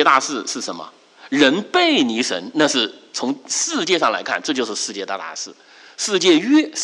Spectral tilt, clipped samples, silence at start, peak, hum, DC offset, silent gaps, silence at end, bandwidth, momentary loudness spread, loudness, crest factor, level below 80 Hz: -2 dB/octave; under 0.1%; 0 s; -2 dBFS; none; under 0.1%; none; 0 s; 11.5 kHz; 12 LU; -19 LUFS; 18 dB; -70 dBFS